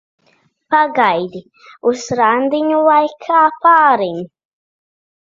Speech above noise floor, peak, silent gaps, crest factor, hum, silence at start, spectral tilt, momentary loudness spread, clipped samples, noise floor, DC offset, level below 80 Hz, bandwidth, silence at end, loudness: 44 dB; 0 dBFS; none; 16 dB; none; 0.7 s; -4.5 dB/octave; 13 LU; under 0.1%; -58 dBFS; under 0.1%; -62 dBFS; 7.6 kHz; 1 s; -14 LUFS